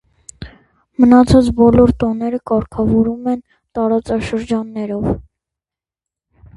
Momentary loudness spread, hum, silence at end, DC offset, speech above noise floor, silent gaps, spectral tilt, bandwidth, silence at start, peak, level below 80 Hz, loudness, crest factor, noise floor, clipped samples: 15 LU; none; 1.35 s; under 0.1%; 75 dB; none; -8 dB/octave; 11.5 kHz; 0.4 s; 0 dBFS; -34 dBFS; -15 LUFS; 16 dB; -88 dBFS; under 0.1%